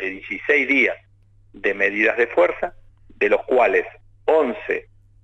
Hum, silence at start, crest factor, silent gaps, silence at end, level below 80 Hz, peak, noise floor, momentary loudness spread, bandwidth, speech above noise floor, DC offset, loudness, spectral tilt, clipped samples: none; 0 s; 16 dB; none; 0.4 s; -52 dBFS; -4 dBFS; -53 dBFS; 10 LU; 8 kHz; 34 dB; under 0.1%; -20 LUFS; -5 dB/octave; under 0.1%